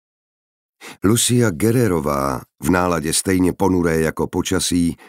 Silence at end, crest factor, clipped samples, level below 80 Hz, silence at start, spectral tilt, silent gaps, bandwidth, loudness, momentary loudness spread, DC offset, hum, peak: 0.15 s; 18 dB; under 0.1%; -42 dBFS; 0.8 s; -4.5 dB/octave; none; 16 kHz; -18 LUFS; 6 LU; under 0.1%; none; -2 dBFS